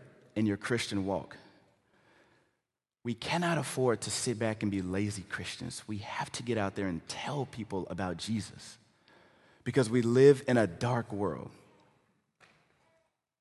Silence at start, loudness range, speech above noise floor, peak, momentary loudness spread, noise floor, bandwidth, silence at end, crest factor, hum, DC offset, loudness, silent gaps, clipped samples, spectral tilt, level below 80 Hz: 0 s; 7 LU; 55 dB; -10 dBFS; 13 LU; -86 dBFS; 12.5 kHz; 1.95 s; 24 dB; none; under 0.1%; -32 LUFS; none; under 0.1%; -5.5 dB/octave; -60 dBFS